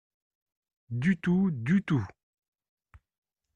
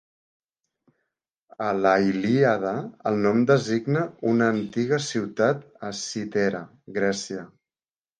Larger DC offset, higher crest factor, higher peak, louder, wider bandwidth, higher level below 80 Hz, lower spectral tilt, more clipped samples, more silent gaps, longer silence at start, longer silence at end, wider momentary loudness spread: neither; about the same, 16 dB vs 20 dB; second, -16 dBFS vs -4 dBFS; second, -28 LUFS vs -24 LUFS; second, 7.2 kHz vs 9.8 kHz; about the same, -62 dBFS vs -66 dBFS; first, -8.5 dB/octave vs -5.5 dB/octave; neither; neither; second, 0.9 s vs 1.6 s; first, 1.5 s vs 0.75 s; about the same, 9 LU vs 11 LU